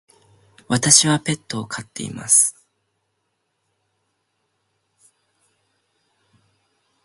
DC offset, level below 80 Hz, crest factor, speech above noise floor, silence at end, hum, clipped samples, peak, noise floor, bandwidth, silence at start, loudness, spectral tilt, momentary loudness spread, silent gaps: under 0.1%; -62 dBFS; 24 dB; 54 dB; 4.55 s; none; under 0.1%; 0 dBFS; -73 dBFS; 16 kHz; 0.7 s; -17 LUFS; -2 dB/octave; 18 LU; none